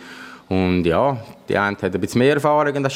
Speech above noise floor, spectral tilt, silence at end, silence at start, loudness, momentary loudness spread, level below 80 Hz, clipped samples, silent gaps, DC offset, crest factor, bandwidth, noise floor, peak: 20 dB; -6.5 dB/octave; 0 s; 0 s; -19 LUFS; 11 LU; -52 dBFS; under 0.1%; none; under 0.1%; 16 dB; 16 kHz; -39 dBFS; -4 dBFS